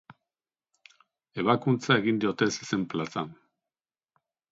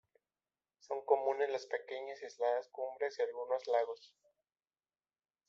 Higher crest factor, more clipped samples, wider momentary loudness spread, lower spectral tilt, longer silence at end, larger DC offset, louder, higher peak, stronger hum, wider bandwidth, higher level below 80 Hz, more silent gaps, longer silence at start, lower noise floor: about the same, 24 dB vs 22 dB; neither; about the same, 11 LU vs 11 LU; first, -5.5 dB/octave vs 0 dB/octave; second, 1.2 s vs 1.4 s; neither; first, -27 LUFS vs -37 LUFS; first, -6 dBFS vs -16 dBFS; neither; about the same, 8 kHz vs 7.6 kHz; first, -68 dBFS vs under -90 dBFS; neither; first, 1.35 s vs 0.9 s; about the same, under -90 dBFS vs under -90 dBFS